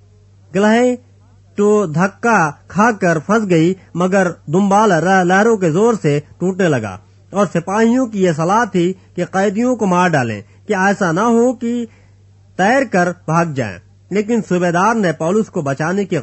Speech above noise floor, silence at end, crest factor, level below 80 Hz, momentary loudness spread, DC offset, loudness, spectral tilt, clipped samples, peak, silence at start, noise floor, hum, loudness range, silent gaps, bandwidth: 32 dB; 0 s; 14 dB; -56 dBFS; 9 LU; under 0.1%; -15 LUFS; -6 dB/octave; under 0.1%; 0 dBFS; 0.5 s; -46 dBFS; none; 3 LU; none; 8.4 kHz